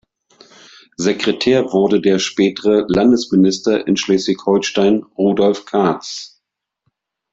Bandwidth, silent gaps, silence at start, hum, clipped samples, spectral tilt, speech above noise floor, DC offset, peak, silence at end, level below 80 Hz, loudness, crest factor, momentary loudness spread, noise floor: 7.8 kHz; none; 1 s; none; under 0.1%; -5 dB/octave; 61 dB; under 0.1%; -2 dBFS; 1.05 s; -52 dBFS; -15 LUFS; 14 dB; 6 LU; -75 dBFS